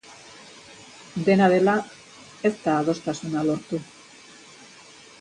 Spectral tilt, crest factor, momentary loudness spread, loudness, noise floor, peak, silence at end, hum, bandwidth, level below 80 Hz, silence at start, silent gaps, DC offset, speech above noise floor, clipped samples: -6 dB/octave; 20 dB; 27 LU; -23 LUFS; -48 dBFS; -6 dBFS; 1.4 s; none; 10.5 kHz; -66 dBFS; 0.1 s; none; under 0.1%; 26 dB; under 0.1%